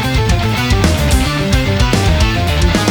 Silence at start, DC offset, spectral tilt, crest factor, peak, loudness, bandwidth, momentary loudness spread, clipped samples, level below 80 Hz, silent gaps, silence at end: 0 s; under 0.1%; -5 dB/octave; 12 dB; 0 dBFS; -13 LUFS; over 20 kHz; 2 LU; under 0.1%; -18 dBFS; none; 0 s